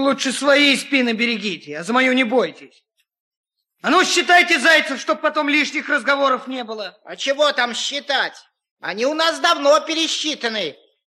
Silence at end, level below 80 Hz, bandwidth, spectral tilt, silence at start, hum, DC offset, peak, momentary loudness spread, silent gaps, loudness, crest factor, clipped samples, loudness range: 0.45 s; -76 dBFS; 13.5 kHz; -2 dB/octave; 0 s; none; under 0.1%; -2 dBFS; 13 LU; 3.20-3.31 s, 3.37-3.44 s, 8.71-8.76 s; -17 LUFS; 18 dB; under 0.1%; 5 LU